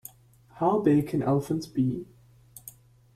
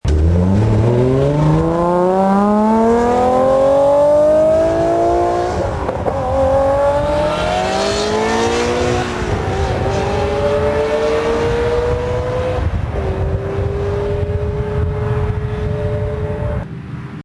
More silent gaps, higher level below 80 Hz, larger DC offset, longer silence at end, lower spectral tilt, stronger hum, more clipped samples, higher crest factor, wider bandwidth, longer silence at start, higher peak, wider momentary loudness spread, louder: neither; second, -60 dBFS vs -26 dBFS; neither; first, 0.45 s vs 0.05 s; about the same, -8 dB/octave vs -7 dB/octave; neither; neither; first, 18 dB vs 12 dB; first, 15.5 kHz vs 11 kHz; first, 0.55 s vs 0.05 s; second, -10 dBFS vs -2 dBFS; first, 22 LU vs 8 LU; second, -26 LUFS vs -16 LUFS